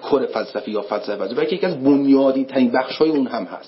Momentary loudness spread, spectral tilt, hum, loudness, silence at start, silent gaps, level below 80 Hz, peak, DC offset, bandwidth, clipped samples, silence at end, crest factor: 10 LU; -10.5 dB/octave; none; -19 LUFS; 0 s; none; -66 dBFS; -4 dBFS; under 0.1%; 5.8 kHz; under 0.1%; 0 s; 14 dB